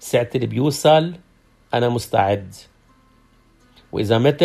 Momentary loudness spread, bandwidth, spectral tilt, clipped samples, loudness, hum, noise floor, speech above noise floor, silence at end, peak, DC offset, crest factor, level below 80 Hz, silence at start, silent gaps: 14 LU; 14.5 kHz; -5.5 dB/octave; under 0.1%; -19 LUFS; none; -55 dBFS; 37 dB; 0 s; -2 dBFS; under 0.1%; 18 dB; -54 dBFS; 0 s; none